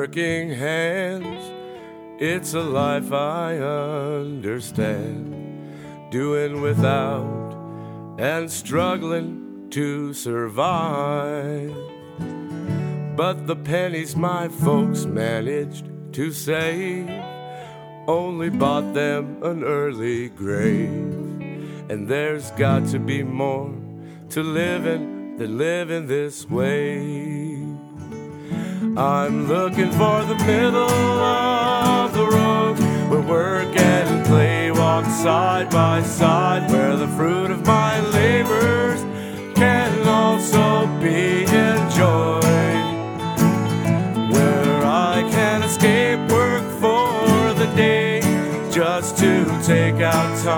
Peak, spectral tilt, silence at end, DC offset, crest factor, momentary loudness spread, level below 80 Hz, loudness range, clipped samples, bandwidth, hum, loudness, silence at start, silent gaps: -2 dBFS; -5.5 dB/octave; 0 s; under 0.1%; 18 dB; 15 LU; -56 dBFS; 8 LU; under 0.1%; over 20 kHz; none; -20 LUFS; 0 s; none